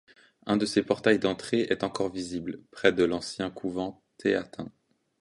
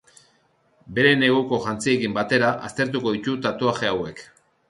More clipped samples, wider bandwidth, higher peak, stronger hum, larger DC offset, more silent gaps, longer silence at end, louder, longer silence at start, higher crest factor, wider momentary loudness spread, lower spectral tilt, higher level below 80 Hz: neither; about the same, 11.5 kHz vs 11.5 kHz; about the same, -6 dBFS vs -4 dBFS; neither; neither; neither; about the same, 0.5 s vs 0.45 s; second, -28 LUFS vs -22 LUFS; second, 0.45 s vs 0.85 s; about the same, 22 dB vs 20 dB; first, 14 LU vs 9 LU; about the same, -5 dB/octave vs -5 dB/octave; about the same, -60 dBFS vs -58 dBFS